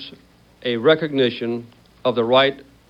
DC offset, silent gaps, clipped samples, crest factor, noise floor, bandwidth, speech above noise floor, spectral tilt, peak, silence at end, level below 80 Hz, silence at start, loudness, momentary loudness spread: under 0.1%; none; under 0.1%; 18 dB; -50 dBFS; 6.8 kHz; 31 dB; -7 dB/octave; -4 dBFS; 0.25 s; -60 dBFS; 0 s; -19 LUFS; 13 LU